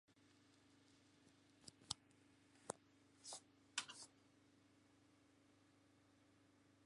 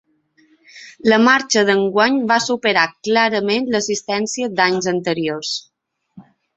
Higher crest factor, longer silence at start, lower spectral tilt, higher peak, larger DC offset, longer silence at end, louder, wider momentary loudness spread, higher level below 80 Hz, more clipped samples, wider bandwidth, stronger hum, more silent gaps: first, 40 dB vs 18 dB; second, 0.1 s vs 0.75 s; second, -1 dB/octave vs -3.5 dB/octave; second, -22 dBFS vs -2 dBFS; neither; second, 0 s vs 0.35 s; second, -54 LUFS vs -17 LUFS; first, 15 LU vs 8 LU; second, -86 dBFS vs -62 dBFS; neither; first, 11.5 kHz vs 8.2 kHz; neither; neither